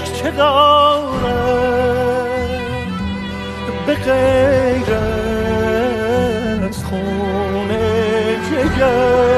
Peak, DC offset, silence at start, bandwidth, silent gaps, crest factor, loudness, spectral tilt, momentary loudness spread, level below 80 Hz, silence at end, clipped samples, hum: 0 dBFS; under 0.1%; 0 s; 13.5 kHz; none; 16 dB; -16 LUFS; -6 dB/octave; 10 LU; -32 dBFS; 0 s; under 0.1%; none